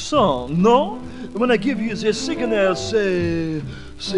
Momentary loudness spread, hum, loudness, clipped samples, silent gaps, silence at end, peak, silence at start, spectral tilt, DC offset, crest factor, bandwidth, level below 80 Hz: 13 LU; none; -20 LUFS; under 0.1%; none; 0 s; -2 dBFS; 0 s; -5.5 dB/octave; under 0.1%; 16 dB; 11 kHz; -44 dBFS